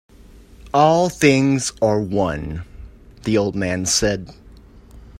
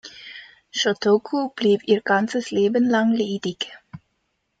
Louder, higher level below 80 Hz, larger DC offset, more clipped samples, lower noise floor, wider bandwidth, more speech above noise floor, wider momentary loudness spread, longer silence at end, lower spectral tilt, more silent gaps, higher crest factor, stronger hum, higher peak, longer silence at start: first, -18 LUFS vs -21 LUFS; first, -42 dBFS vs -66 dBFS; neither; neither; second, -44 dBFS vs -73 dBFS; first, 16 kHz vs 9 kHz; second, 27 dB vs 52 dB; about the same, 15 LU vs 15 LU; second, 0.05 s vs 0.65 s; about the same, -4.5 dB/octave vs -4.5 dB/octave; neither; about the same, 20 dB vs 16 dB; neither; first, 0 dBFS vs -6 dBFS; first, 0.6 s vs 0.05 s